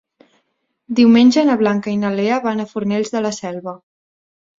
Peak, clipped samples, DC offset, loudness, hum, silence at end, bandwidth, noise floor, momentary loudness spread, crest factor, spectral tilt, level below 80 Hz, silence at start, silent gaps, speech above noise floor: -2 dBFS; under 0.1%; under 0.1%; -16 LUFS; none; 0.85 s; 7.8 kHz; -69 dBFS; 15 LU; 16 dB; -5.5 dB/octave; -60 dBFS; 0.9 s; none; 53 dB